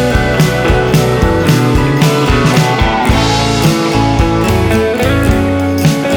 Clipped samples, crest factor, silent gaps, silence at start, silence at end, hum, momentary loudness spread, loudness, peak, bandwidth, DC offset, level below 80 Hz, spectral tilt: under 0.1%; 10 dB; none; 0 s; 0 s; none; 2 LU; -11 LUFS; 0 dBFS; over 20 kHz; under 0.1%; -20 dBFS; -5.5 dB/octave